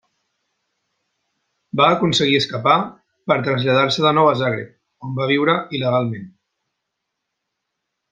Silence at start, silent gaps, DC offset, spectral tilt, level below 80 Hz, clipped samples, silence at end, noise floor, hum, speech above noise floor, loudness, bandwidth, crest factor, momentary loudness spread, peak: 1.75 s; none; under 0.1%; -5.5 dB/octave; -62 dBFS; under 0.1%; 1.85 s; -78 dBFS; none; 61 dB; -18 LUFS; 9.4 kHz; 20 dB; 15 LU; -2 dBFS